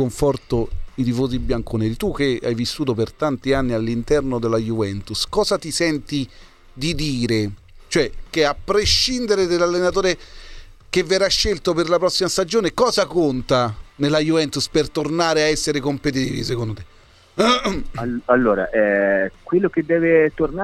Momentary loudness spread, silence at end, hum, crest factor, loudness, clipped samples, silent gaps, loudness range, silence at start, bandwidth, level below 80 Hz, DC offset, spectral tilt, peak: 7 LU; 0 s; none; 18 dB; -20 LUFS; under 0.1%; none; 3 LU; 0 s; 14.5 kHz; -36 dBFS; under 0.1%; -4.5 dB/octave; -2 dBFS